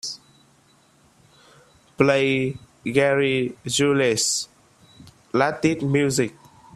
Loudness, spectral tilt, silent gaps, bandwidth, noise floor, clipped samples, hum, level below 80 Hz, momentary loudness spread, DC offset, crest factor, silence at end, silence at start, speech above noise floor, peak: -21 LUFS; -4 dB/octave; none; 14.5 kHz; -58 dBFS; under 0.1%; none; -58 dBFS; 10 LU; under 0.1%; 22 dB; 0.45 s; 0.05 s; 37 dB; -2 dBFS